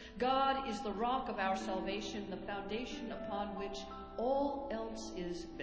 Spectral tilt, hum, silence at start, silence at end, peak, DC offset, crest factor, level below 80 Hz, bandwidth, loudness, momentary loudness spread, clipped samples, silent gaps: -4.5 dB/octave; none; 0 s; 0 s; -20 dBFS; under 0.1%; 18 dB; -58 dBFS; 8 kHz; -38 LUFS; 9 LU; under 0.1%; none